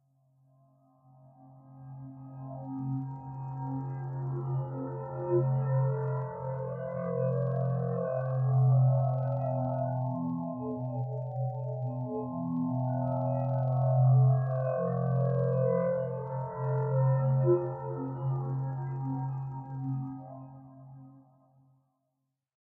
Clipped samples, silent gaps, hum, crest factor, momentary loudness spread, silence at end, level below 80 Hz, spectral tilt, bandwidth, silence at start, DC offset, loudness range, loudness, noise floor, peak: under 0.1%; none; none; 16 dB; 14 LU; 1.4 s; -66 dBFS; -13.5 dB/octave; 2.1 kHz; 1.4 s; under 0.1%; 11 LU; -31 LUFS; -83 dBFS; -14 dBFS